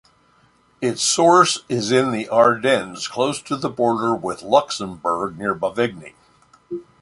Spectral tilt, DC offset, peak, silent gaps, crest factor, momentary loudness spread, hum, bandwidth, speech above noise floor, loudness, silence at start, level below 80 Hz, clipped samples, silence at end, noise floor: -3.5 dB/octave; under 0.1%; 0 dBFS; none; 20 dB; 12 LU; none; 11.5 kHz; 38 dB; -19 LUFS; 0.8 s; -60 dBFS; under 0.1%; 0.2 s; -57 dBFS